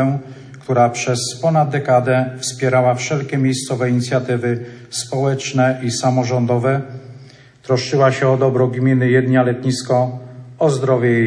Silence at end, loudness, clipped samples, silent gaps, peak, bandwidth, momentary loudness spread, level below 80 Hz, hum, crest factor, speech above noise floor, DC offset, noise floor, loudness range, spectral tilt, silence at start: 0 s; -17 LUFS; under 0.1%; none; -2 dBFS; 10.5 kHz; 10 LU; -62 dBFS; none; 16 dB; 26 dB; under 0.1%; -42 dBFS; 3 LU; -6 dB/octave; 0 s